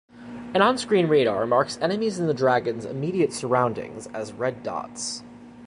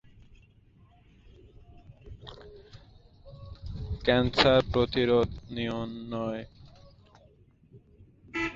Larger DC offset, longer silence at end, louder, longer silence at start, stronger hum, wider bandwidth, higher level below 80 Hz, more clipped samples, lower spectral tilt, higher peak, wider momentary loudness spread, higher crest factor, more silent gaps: neither; about the same, 0 s vs 0 s; first, -24 LUFS vs -27 LUFS; second, 0.15 s vs 1.25 s; neither; first, 11.5 kHz vs 7.6 kHz; second, -62 dBFS vs -46 dBFS; neither; second, -5 dB/octave vs -6.5 dB/octave; about the same, -4 dBFS vs -6 dBFS; second, 14 LU vs 27 LU; second, 20 dB vs 26 dB; neither